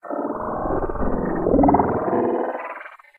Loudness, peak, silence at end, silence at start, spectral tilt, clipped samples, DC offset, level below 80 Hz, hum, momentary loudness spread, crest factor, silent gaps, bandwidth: -22 LUFS; -4 dBFS; 0.25 s; 0.05 s; -11 dB/octave; under 0.1%; under 0.1%; -34 dBFS; none; 12 LU; 18 dB; none; 3.2 kHz